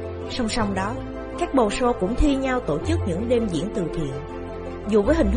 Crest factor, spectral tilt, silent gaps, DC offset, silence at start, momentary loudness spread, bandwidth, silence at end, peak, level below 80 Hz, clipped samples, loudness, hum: 16 dB; -6 dB/octave; none; under 0.1%; 0 s; 12 LU; 10 kHz; 0 s; -6 dBFS; -34 dBFS; under 0.1%; -24 LUFS; none